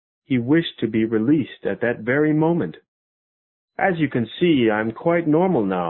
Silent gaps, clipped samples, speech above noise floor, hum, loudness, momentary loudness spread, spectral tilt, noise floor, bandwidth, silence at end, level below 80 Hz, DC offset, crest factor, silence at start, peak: 2.88-3.68 s; under 0.1%; over 70 dB; none; -20 LUFS; 6 LU; -12 dB/octave; under -90 dBFS; 4.2 kHz; 0 s; -56 dBFS; under 0.1%; 16 dB; 0.3 s; -4 dBFS